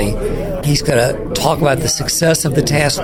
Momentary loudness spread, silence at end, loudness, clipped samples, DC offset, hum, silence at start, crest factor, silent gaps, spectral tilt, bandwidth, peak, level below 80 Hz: 6 LU; 0 s; -15 LUFS; under 0.1%; under 0.1%; none; 0 s; 14 dB; none; -4 dB/octave; 17 kHz; 0 dBFS; -28 dBFS